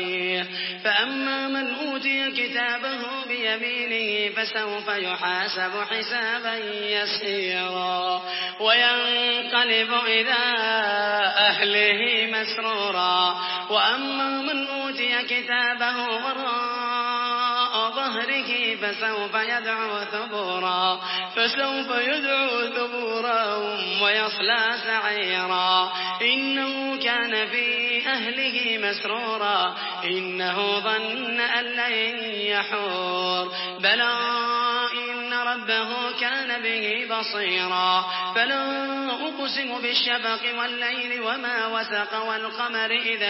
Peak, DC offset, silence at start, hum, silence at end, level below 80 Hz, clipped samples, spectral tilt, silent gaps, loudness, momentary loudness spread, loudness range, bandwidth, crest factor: -6 dBFS; under 0.1%; 0 s; none; 0 s; -86 dBFS; under 0.1%; -6 dB/octave; none; -23 LUFS; 6 LU; 4 LU; 5.8 kHz; 18 dB